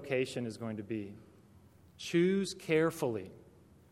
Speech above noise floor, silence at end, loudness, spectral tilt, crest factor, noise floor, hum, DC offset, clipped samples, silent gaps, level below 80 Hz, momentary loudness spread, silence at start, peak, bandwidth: 27 dB; 0.5 s; -34 LUFS; -5.5 dB/octave; 20 dB; -60 dBFS; none; under 0.1%; under 0.1%; none; -72 dBFS; 14 LU; 0 s; -16 dBFS; 16 kHz